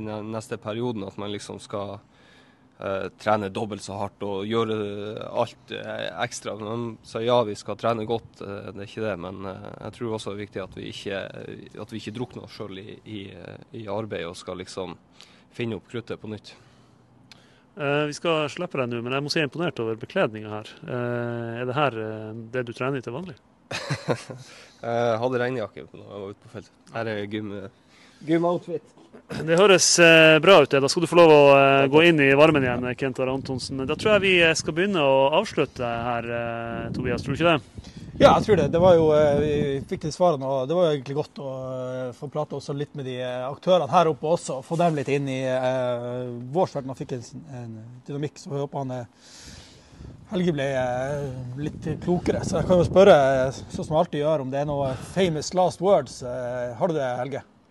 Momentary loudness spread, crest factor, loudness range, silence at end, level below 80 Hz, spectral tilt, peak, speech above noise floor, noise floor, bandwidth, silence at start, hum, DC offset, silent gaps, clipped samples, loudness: 20 LU; 20 dB; 17 LU; 0.3 s; -54 dBFS; -4.5 dB/octave; -4 dBFS; 32 dB; -55 dBFS; 12.5 kHz; 0 s; none; under 0.1%; none; under 0.1%; -23 LUFS